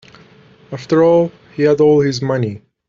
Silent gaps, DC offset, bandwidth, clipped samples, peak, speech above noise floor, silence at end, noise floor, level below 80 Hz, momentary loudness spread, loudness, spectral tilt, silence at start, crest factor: none; under 0.1%; 7.4 kHz; under 0.1%; -2 dBFS; 32 dB; 0.3 s; -45 dBFS; -54 dBFS; 12 LU; -14 LUFS; -7 dB/octave; 0.7 s; 12 dB